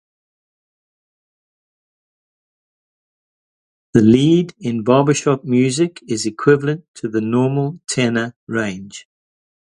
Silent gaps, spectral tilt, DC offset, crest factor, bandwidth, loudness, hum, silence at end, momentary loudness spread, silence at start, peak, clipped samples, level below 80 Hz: 6.88-6.94 s, 8.36-8.47 s; -6 dB/octave; under 0.1%; 18 dB; 11.5 kHz; -17 LUFS; none; 0.65 s; 11 LU; 3.95 s; 0 dBFS; under 0.1%; -54 dBFS